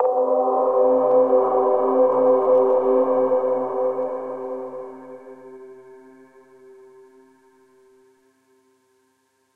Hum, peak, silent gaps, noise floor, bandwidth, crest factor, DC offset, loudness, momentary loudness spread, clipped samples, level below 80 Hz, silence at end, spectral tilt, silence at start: none; -6 dBFS; none; -66 dBFS; 2.9 kHz; 14 dB; under 0.1%; -19 LUFS; 22 LU; under 0.1%; -70 dBFS; 3.6 s; -8.5 dB/octave; 0 s